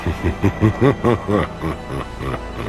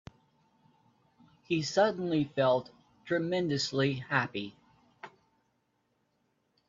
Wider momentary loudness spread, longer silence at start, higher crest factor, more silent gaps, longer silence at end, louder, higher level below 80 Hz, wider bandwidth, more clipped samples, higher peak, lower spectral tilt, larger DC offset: second, 11 LU vs 21 LU; second, 0 s vs 1.5 s; about the same, 20 dB vs 22 dB; neither; second, 0 s vs 1.6 s; first, -20 LUFS vs -30 LUFS; first, -32 dBFS vs -70 dBFS; first, 13.5 kHz vs 7.8 kHz; neither; first, 0 dBFS vs -10 dBFS; first, -8 dB/octave vs -5.5 dB/octave; neither